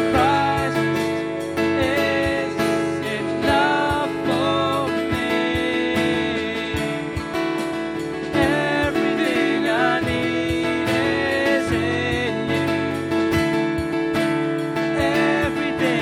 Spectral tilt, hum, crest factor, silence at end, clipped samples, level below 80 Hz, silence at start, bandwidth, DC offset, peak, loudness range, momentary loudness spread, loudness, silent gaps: -5.5 dB/octave; none; 16 dB; 0 s; under 0.1%; -42 dBFS; 0 s; 16 kHz; under 0.1%; -4 dBFS; 2 LU; 5 LU; -21 LUFS; none